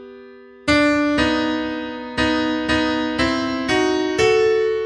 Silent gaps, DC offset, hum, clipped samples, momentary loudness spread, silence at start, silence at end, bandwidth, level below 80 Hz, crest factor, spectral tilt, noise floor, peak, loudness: none; under 0.1%; none; under 0.1%; 8 LU; 0 s; 0 s; 11 kHz; -42 dBFS; 16 dB; -4.5 dB/octave; -42 dBFS; -4 dBFS; -19 LUFS